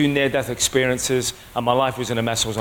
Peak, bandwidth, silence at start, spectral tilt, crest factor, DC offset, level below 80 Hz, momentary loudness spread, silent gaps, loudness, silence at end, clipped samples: -4 dBFS; 17 kHz; 0 s; -3.5 dB/octave; 16 dB; under 0.1%; -46 dBFS; 5 LU; none; -21 LUFS; 0 s; under 0.1%